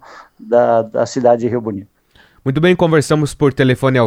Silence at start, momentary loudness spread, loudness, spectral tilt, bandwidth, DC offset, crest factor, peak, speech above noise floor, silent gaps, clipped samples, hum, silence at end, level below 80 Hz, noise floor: 0.1 s; 9 LU; -15 LUFS; -6.5 dB/octave; 15 kHz; under 0.1%; 14 dB; 0 dBFS; 37 dB; none; under 0.1%; none; 0 s; -46 dBFS; -50 dBFS